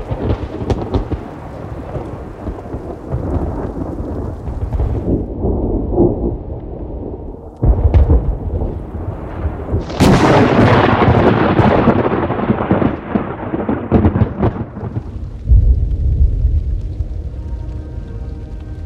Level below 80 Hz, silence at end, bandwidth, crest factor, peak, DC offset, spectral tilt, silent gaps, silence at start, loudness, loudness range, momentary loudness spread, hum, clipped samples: -20 dBFS; 0 s; 11.5 kHz; 16 dB; 0 dBFS; under 0.1%; -8 dB/octave; none; 0 s; -16 LUFS; 11 LU; 16 LU; none; under 0.1%